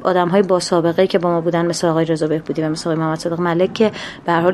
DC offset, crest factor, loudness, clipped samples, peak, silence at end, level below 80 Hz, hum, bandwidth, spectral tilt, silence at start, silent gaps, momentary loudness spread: under 0.1%; 16 dB; -17 LUFS; under 0.1%; -2 dBFS; 0 s; -54 dBFS; none; 12.5 kHz; -6 dB/octave; 0 s; none; 5 LU